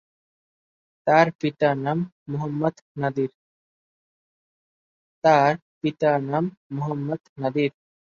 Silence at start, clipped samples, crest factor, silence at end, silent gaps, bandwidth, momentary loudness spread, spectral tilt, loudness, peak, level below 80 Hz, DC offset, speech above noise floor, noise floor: 1.05 s; under 0.1%; 22 dB; 0.3 s; 1.35-1.39 s, 2.12-2.26 s, 2.82-2.95 s, 3.34-5.22 s, 5.62-5.81 s, 6.57-6.70 s, 7.29-7.36 s; 7.2 kHz; 11 LU; -7.5 dB/octave; -24 LUFS; -2 dBFS; -68 dBFS; under 0.1%; over 67 dB; under -90 dBFS